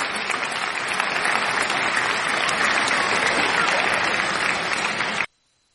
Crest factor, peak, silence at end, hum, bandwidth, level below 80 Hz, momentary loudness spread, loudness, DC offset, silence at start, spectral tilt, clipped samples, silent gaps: 18 dB; -6 dBFS; 0.5 s; none; 11.5 kHz; -58 dBFS; 5 LU; -21 LUFS; under 0.1%; 0 s; -1.5 dB/octave; under 0.1%; none